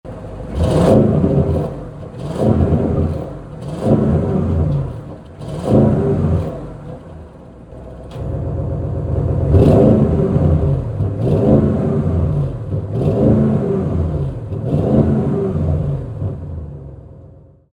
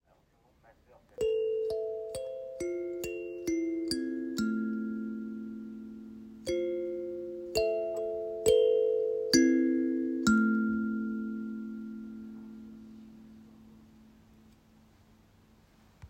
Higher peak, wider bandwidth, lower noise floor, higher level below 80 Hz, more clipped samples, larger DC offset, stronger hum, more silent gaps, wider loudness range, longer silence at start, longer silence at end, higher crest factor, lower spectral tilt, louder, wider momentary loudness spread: first, 0 dBFS vs -10 dBFS; second, 10.5 kHz vs 16 kHz; second, -42 dBFS vs -67 dBFS; first, -30 dBFS vs -62 dBFS; neither; neither; neither; neither; second, 5 LU vs 14 LU; second, 0.05 s vs 1.2 s; first, 0.45 s vs 0 s; second, 16 dB vs 22 dB; first, -10 dB/octave vs -4.5 dB/octave; first, -16 LUFS vs -31 LUFS; about the same, 19 LU vs 20 LU